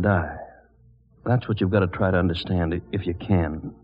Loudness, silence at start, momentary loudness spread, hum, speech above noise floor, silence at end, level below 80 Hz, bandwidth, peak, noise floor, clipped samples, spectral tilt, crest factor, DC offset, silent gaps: -24 LUFS; 0 s; 12 LU; none; 33 dB; 0.1 s; -42 dBFS; 5.2 kHz; -6 dBFS; -56 dBFS; under 0.1%; -6.5 dB/octave; 18 dB; under 0.1%; none